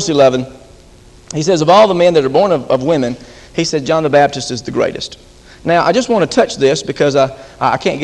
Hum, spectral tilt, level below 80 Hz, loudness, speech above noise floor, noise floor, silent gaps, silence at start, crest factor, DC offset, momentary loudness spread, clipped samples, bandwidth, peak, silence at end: none; -5 dB/octave; -44 dBFS; -13 LUFS; 28 dB; -41 dBFS; none; 0 s; 14 dB; under 0.1%; 12 LU; under 0.1%; 11 kHz; 0 dBFS; 0 s